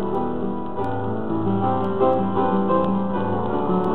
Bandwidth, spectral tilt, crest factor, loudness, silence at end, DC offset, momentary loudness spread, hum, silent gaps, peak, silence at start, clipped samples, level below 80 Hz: 4.2 kHz; -10.5 dB/octave; 14 dB; -22 LUFS; 0 s; 3%; 7 LU; none; none; -8 dBFS; 0 s; under 0.1%; -46 dBFS